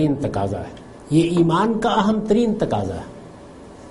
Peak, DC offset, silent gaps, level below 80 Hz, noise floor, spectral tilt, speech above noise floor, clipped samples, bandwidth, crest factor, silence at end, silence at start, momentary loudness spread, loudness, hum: -4 dBFS; under 0.1%; none; -44 dBFS; -40 dBFS; -7 dB/octave; 21 dB; under 0.1%; 11.5 kHz; 16 dB; 0 s; 0 s; 22 LU; -20 LUFS; none